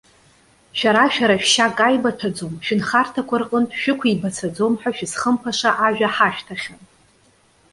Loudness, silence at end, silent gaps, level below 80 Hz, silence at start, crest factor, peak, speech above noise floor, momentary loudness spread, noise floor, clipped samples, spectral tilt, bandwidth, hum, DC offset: -19 LUFS; 1 s; none; -60 dBFS; 0.75 s; 18 dB; -2 dBFS; 37 dB; 11 LU; -56 dBFS; under 0.1%; -3.5 dB/octave; 11.5 kHz; none; under 0.1%